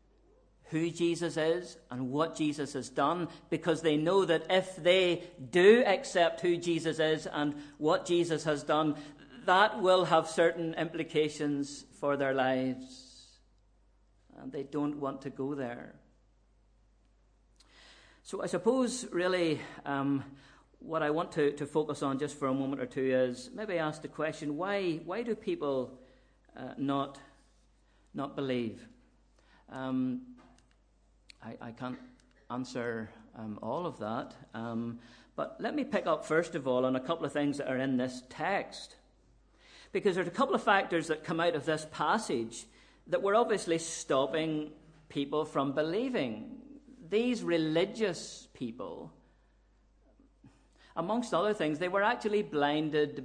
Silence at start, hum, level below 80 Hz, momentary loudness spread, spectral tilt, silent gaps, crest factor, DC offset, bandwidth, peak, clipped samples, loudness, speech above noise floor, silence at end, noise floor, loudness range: 0.7 s; none; -66 dBFS; 15 LU; -5 dB/octave; none; 22 dB; under 0.1%; 10.5 kHz; -10 dBFS; under 0.1%; -32 LUFS; 35 dB; 0 s; -66 dBFS; 12 LU